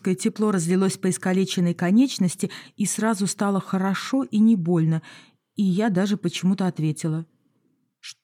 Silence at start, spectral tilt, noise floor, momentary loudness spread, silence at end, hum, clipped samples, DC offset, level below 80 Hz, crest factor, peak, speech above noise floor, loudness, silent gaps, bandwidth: 0.05 s; -5.5 dB/octave; -69 dBFS; 9 LU; 0.1 s; none; under 0.1%; under 0.1%; -78 dBFS; 14 dB; -8 dBFS; 47 dB; -23 LUFS; none; 15.5 kHz